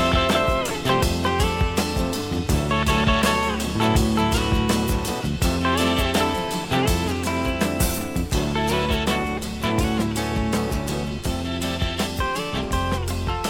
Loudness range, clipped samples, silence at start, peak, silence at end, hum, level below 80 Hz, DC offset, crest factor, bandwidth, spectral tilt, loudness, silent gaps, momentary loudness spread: 3 LU; under 0.1%; 0 s; -6 dBFS; 0 s; none; -30 dBFS; under 0.1%; 16 dB; 18 kHz; -5 dB/octave; -22 LUFS; none; 6 LU